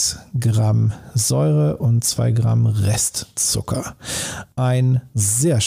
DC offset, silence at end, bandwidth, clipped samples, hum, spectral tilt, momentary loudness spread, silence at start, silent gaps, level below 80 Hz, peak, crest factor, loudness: under 0.1%; 0 s; 16 kHz; under 0.1%; none; -4.5 dB/octave; 8 LU; 0 s; none; -46 dBFS; -8 dBFS; 10 dB; -19 LUFS